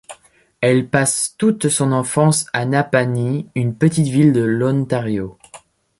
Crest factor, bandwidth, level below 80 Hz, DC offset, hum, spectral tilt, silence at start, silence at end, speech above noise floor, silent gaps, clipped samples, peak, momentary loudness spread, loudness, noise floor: 16 dB; 12 kHz; -54 dBFS; under 0.1%; none; -5.5 dB/octave; 0.1 s; 0.4 s; 33 dB; none; under 0.1%; -2 dBFS; 7 LU; -17 LUFS; -50 dBFS